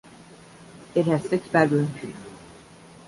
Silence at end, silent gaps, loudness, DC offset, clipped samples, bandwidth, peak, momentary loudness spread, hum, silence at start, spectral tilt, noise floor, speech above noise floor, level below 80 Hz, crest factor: 0.65 s; none; -23 LUFS; under 0.1%; under 0.1%; 11.5 kHz; -6 dBFS; 23 LU; none; 0.6 s; -7 dB/octave; -48 dBFS; 25 dB; -62 dBFS; 20 dB